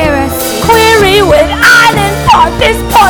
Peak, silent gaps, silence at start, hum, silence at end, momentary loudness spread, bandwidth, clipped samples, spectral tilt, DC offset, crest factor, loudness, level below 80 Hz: 0 dBFS; none; 0 s; none; 0 s; 7 LU; over 20 kHz; 4%; -3.5 dB/octave; under 0.1%; 6 dB; -6 LUFS; -22 dBFS